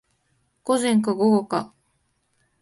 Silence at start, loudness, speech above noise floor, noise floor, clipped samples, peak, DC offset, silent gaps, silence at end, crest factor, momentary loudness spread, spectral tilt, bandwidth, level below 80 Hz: 0.65 s; -22 LUFS; 49 dB; -70 dBFS; under 0.1%; -8 dBFS; under 0.1%; none; 0.95 s; 16 dB; 14 LU; -5.5 dB/octave; 11.5 kHz; -68 dBFS